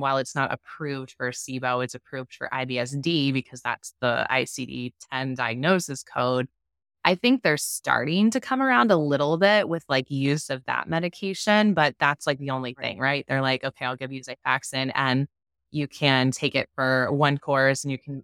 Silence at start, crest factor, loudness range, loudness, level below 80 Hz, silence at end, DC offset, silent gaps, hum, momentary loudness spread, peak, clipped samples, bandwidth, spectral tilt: 0 s; 22 dB; 5 LU; -24 LUFS; -66 dBFS; 0 s; under 0.1%; none; none; 11 LU; -2 dBFS; under 0.1%; 17 kHz; -4.5 dB/octave